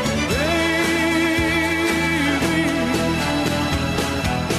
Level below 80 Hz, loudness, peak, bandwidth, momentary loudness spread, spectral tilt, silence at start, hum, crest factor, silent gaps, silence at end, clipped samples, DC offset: -36 dBFS; -19 LUFS; -8 dBFS; 13.5 kHz; 3 LU; -4.5 dB/octave; 0 s; none; 12 dB; none; 0 s; under 0.1%; under 0.1%